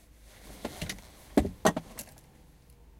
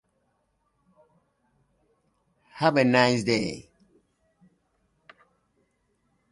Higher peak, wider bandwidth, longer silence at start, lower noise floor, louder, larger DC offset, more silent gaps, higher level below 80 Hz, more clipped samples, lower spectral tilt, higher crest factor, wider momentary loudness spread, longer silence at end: about the same, -8 dBFS vs -6 dBFS; first, 16.5 kHz vs 11.5 kHz; second, 0.4 s vs 2.55 s; second, -57 dBFS vs -73 dBFS; second, -32 LUFS vs -23 LUFS; neither; neither; first, -48 dBFS vs -66 dBFS; neither; about the same, -4.5 dB/octave vs -5 dB/octave; about the same, 26 dB vs 24 dB; first, 21 LU vs 13 LU; second, 0.85 s vs 2.7 s